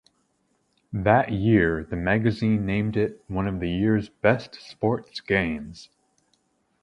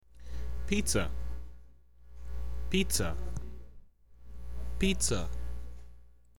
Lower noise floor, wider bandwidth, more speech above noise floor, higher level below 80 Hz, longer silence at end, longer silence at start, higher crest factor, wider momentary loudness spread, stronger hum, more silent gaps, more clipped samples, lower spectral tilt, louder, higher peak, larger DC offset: first, -70 dBFS vs -57 dBFS; second, 9.4 kHz vs 18.5 kHz; first, 46 dB vs 27 dB; second, -46 dBFS vs -40 dBFS; first, 1 s vs 0 s; first, 0.9 s vs 0 s; about the same, 22 dB vs 20 dB; second, 9 LU vs 21 LU; neither; neither; neither; first, -8 dB/octave vs -4 dB/octave; first, -24 LUFS vs -34 LUFS; first, -4 dBFS vs -14 dBFS; second, under 0.1% vs 2%